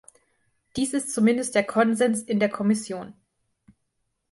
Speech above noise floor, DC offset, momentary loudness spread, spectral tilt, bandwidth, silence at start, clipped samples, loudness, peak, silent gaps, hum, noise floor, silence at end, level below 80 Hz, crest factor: 53 dB; under 0.1%; 14 LU; -4.5 dB/octave; 11.5 kHz; 0.75 s; under 0.1%; -24 LUFS; -8 dBFS; none; none; -76 dBFS; 1.2 s; -64 dBFS; 18 dB